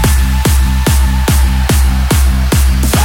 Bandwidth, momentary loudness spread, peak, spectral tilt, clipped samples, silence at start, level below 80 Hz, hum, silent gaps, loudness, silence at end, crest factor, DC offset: 17 kHz; 0 LU; -2 dBFS; -5 dB/octave; under 0.1%; 0 s; -10 dBFS; none; none; -12 LUFS; 0 s; 8 dB; under 0.1%